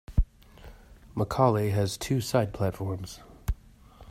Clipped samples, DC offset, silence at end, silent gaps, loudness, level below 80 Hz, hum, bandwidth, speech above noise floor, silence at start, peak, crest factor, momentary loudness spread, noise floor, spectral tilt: under 0.1%; under 0.1%; 0 s; none; -29 LUFS; -38 dBFS; none; 16 kHz; 25 dB; 0.1 s; -8 dBFS; 22 dB; 15 LU; -52 dBFS; -6.5 dB/octave